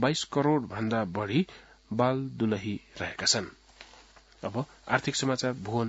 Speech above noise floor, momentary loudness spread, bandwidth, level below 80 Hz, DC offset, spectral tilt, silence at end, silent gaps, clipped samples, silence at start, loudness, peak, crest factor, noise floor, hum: 26 dB; 10 LU; 8 kHz; -62 dBFS; under 0.1%; -4.5 dB/octave; 0 s; none; under 0.1%; 0 s; -29 LUFS; -6 dBFS; 24 dB; -56 dBFS; none